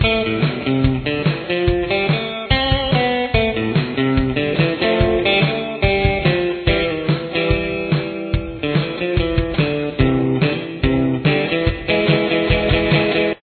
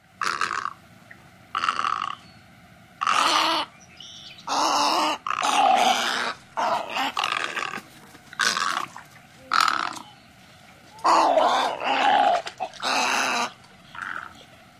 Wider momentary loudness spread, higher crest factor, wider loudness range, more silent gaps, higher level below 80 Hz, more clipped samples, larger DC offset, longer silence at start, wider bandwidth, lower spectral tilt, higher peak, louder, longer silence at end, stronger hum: second, 4 LU vs 17 LU; about the same, 18 dB vs 22 dB; second, 2 LU vs 5 LU; neither; first, -30 dBFS vs -66 dBFS; neither; neither; second, 0 s vs 0.2 s; second, 4.6 kHz vs 15.5 kHz; first, -9.5 dB/octave vs -1 dB/octave; first, 0 dBFS vs -4 dBFS; first, -18 LUFS vs -23 LUFS; second, 0.05 s vs 0.35 s; neither